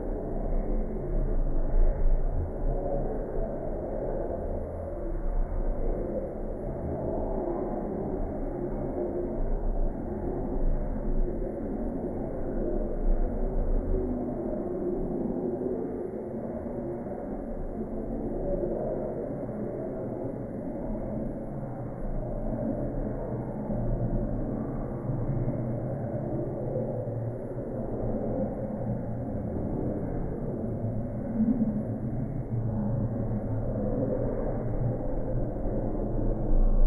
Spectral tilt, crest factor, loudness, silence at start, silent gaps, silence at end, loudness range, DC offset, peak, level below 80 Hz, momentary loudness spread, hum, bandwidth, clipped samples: -12.5 dB/octave; 18 dB; -33 LUFS; 0 s; none; 0 s; 3 LU; under 0.1%; -12 dBFS; -32 dBFS; 5 LU; none; 2.3 kHz; under 0.1%